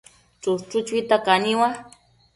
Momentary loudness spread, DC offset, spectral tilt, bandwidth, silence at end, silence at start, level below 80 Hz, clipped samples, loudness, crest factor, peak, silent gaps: 10 LU; under 0.1%; -4 dB/octave; 11.5 kHz; 0.5 s; 0.45 s; -64 dBFS; under 0.1%; -22 LUFS; 18 dB; -4 dBFS; none